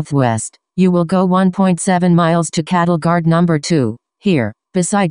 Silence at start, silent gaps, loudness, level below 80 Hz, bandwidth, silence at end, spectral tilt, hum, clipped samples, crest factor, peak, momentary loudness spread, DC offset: 0 s; none; -15 LUFS; -52 dBFS; 10.5 kHz; 0 s; -6 dB/octave; none; under 0.1%; 14 dB; 0 dBFS; 7 LU; under 0.1%